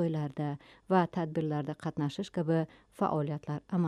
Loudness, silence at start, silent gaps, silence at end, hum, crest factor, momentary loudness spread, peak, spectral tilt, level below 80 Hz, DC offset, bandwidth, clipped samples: -33 LUFS; 0 s; none; 0 s; none; 18 dB; 9 LU; -14 dBFS; -8 dB/octave; -68 dBFS; under 0.1%; 11 kHz; under 0.1%